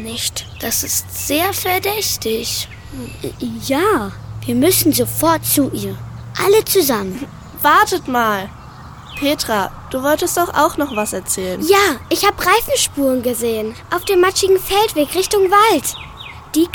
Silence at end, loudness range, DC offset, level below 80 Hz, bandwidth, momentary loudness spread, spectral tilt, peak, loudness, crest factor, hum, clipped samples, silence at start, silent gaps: 0 s; 4 LU; under 0.1%; -42 dBFS; 19 kHz; 15 LU; -3 dB/octave; 0 dBFS; -16 LUFS; 16 dB; none; under 0.1%; 0 s; none